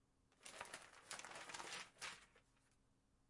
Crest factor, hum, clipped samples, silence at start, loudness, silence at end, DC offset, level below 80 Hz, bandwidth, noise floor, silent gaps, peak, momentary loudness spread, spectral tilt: 28 dB; none; under 0.1%; 0.3 s; -54 LUFS; 0 s; under 0.1%; -84 dBFS; 12 kHz; -79 dBFS; none; -30 dBFS; 8 LU; -0.5 dB/octave